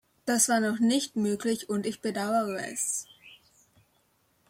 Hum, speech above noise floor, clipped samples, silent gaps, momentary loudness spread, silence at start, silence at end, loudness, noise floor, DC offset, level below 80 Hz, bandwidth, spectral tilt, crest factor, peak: none; 42 dB; under 0.1%; none; 8 LU; 0.25 s; 1.15 s; -28 LUFS; -69 dBFS; under 0.1%; -74 dBFS; 16.5 kHz; -3 dB/octave; 20 dB; -10 dBFS